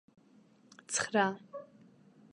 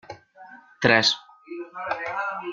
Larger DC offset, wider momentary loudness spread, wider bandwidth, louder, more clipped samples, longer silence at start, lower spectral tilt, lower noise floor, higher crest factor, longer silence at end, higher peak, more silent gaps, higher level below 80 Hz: neither; second, 19 LU vs 23 LU; first, 11 kHz vs 9.4 kHz; second, -33 LUFS vs -23 LUFS; neither; first, 0.9 s vs 0.1 s; about the same, -3 dB/octave vs -3.5 dB/octave; first, -63 dBFS vs -48 dBFS; about the same, 24 dB vs 24 dB; first, 0.7 s vs 0 s; second, -14 dBFS vs -2 dBFS; neither; second, -80 dBFS vs -62 dBFS